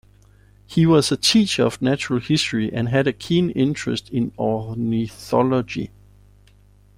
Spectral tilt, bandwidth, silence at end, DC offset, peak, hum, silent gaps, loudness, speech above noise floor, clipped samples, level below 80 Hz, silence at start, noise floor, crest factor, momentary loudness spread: -5.5 dB/octave; 16 kHz; 1.1 s; under 0.1%; -4 dBFS; 50 Hz at -45 dBFS; none; -20 LUFS; 32 dB; under 0.1%; -50 dBFS; 0.7 s; -52 dBFS; 16 dB; 9 LU